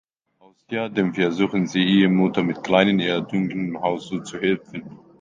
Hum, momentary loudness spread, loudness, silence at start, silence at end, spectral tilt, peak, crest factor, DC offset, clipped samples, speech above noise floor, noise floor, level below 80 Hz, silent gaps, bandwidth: none; 11 LU; -21 LUFS; 0.7 s; 0.25 s; -6.5 dB/octave; 0 dBFS; 22 dB; under 0.1%; under 0.1%; 36 dB; -57 dBFS; -60 dBFS; none; 7.6 kHz